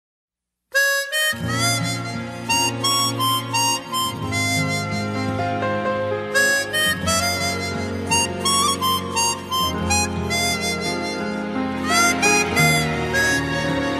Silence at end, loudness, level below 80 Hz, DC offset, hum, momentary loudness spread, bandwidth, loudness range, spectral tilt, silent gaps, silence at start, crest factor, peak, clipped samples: 0 s; -20 LUFS; -46 dBFS; under 0.1%; none; 8 LU; 15.5 kHz; 2 LU; -3 dB/octave; none; 0.7 s; 16 dB; -4 dBFS; under 0.1%